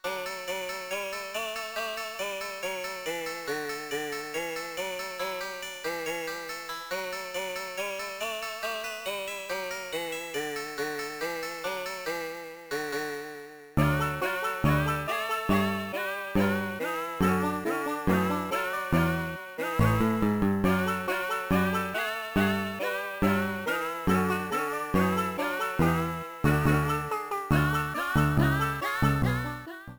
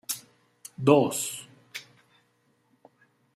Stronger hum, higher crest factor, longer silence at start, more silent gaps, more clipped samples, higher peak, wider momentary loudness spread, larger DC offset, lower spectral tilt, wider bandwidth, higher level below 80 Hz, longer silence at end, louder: second, none vs 60 Hz at -60 dBFS; second, 18 dB vs 26 dB; about the same, 0.05 s vs 0.1 s; neither; neither; second, -10 dBFS vs -4 dBFS; second, 8 LU vs 22 LU; neither; about the same, -5.5 dB/octave vs -5 dB/octave; first, over 20 kHz vs 16 kHz; first, -46 dBFS vs -76 dBFS; second, 0 s vs 1.55 s; second, -29 LUFS vs -25 LUFS